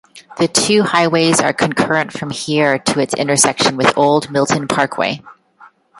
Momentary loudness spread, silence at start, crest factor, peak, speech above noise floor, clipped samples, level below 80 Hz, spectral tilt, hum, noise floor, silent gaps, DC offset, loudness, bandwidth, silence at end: 7 LU; 0.15 s; 16 dB; 0 dBFS; 32 dB; under 0.1%; -54 dBFS; -3.5 dB/octave; none; -46 dBFS; none; under 0.1%; -15 LUFS; 14 kHz; 0.35 s